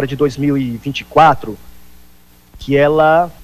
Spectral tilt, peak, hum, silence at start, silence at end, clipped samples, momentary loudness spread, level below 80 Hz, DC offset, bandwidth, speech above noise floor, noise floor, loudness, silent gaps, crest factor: -7 dB/octave; -2 dBFS; 60 Hz at -45 dBFS; 0 s; 0.1 s; under 0.1%; 17 LU; -42 dBFS; under 0.1%; 15 kHz; 33 dB; -47 dBFS; -14 LUFS; none; 14 dB